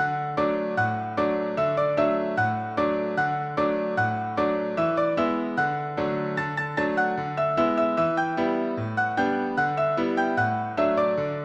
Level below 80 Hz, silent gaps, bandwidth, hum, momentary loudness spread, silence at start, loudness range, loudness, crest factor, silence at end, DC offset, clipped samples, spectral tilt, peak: -60 dBFS; none; 8.2 kHz; none; 4 LU; 0 s; 1 LU; -25 LUFS; 14 dB; 0 s; under 0.1%; under 0.1%; -7.5 dB/octave; -10 dBFS